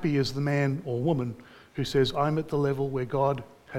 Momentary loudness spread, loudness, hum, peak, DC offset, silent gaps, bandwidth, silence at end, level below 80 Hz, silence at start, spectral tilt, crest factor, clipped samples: 10 LU; -28 LUFS; none; -12 dBFS; under 0.1%; none; 14.5 kHz; 0 s; -54 dBFS; 0 s; -7 dB/octave; 16 dB; under 0.1%